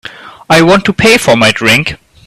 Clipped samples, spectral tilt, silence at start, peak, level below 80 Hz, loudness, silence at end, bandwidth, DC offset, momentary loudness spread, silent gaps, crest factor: 0.4%; -4 dB/octave; 0.05 s; 0 dBFS; -38 dBFS; -7 LUFS; 0.3 s; 16 kHz; under 0.1%; 7 LU; none; 10 dB